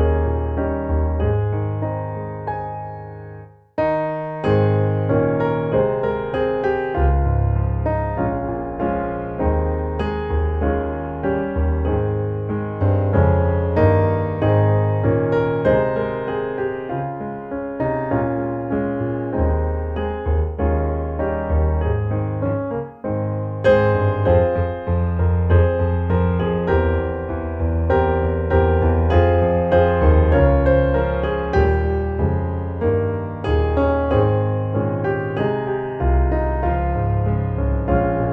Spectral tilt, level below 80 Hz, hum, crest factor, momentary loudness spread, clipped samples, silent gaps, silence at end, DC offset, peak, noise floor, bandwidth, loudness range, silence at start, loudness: -10.5 dB/octave; -26 dBFS; none; 16 dB; 8 LU; under 0.1%; none; 0 s; under 0.1%; -2 dBFS; -39 dBFS; 4.6 kHz; 6 LU; 0 s; -20 LUFS